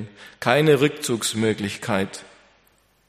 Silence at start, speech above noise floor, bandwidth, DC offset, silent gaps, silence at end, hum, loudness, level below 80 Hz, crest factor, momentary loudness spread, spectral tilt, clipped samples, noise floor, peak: 0 s; 39 dB; 15.5 kHz; under 0.1%; none; 0.85 s; none; -21 LUFS; -62 dBFS; 22 dB; 13 LU; -4.5 dB/octave; under 0.1%; -61 dBFS; 0 dBFS